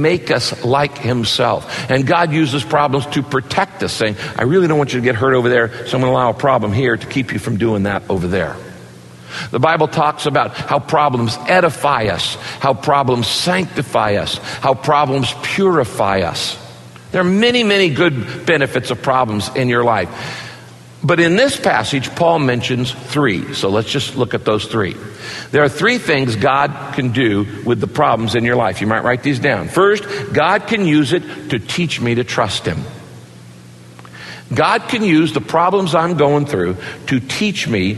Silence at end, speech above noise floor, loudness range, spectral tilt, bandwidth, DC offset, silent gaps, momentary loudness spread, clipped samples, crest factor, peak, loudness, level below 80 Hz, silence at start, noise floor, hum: 0 s; 23 dB; 3 LU; -5.5 dB/octave; 12.5 kHz; under 0.1%; none; 7 LU; under 0.1%; 16 dB; 0 dBFS; -16 LUFS; -48 dBFS; 0 s; -38 dBFS; none